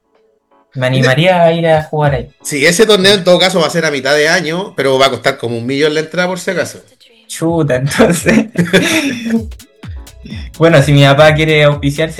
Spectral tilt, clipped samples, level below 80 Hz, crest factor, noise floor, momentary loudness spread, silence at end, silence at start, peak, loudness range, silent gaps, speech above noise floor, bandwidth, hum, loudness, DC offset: -5 dB/octave; 0.3%; -36 dBFS; 12 dB; -55 dBFS; 13 LU; 0 s; 0.75 s; 0 dBFS; 4 LU; none; 44 dB; 16 kHz; none; -11 LUFS; 0.2%